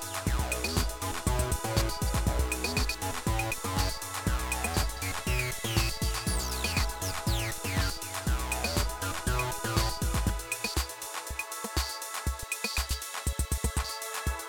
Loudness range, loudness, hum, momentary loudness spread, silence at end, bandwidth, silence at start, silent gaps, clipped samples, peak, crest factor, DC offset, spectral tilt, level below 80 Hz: 2 LU; -31 LUFS; none; 4 LU; 0 s; 18.5 kHz; 0 s; none; under 0.1%; -12 dBFS; 20 dB; under 0.1%; -3.5 dB/octave; -36 dBFS